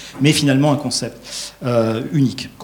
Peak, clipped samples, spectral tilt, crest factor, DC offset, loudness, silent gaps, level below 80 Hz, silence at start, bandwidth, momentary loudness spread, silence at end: 0 dBFS; under 0.1%; -5 dB/octave; 18 dB; under 0.1%; -18 LUFS; none; -52 dBFS; 0 s; 19 kHz; 12 LU; 0 s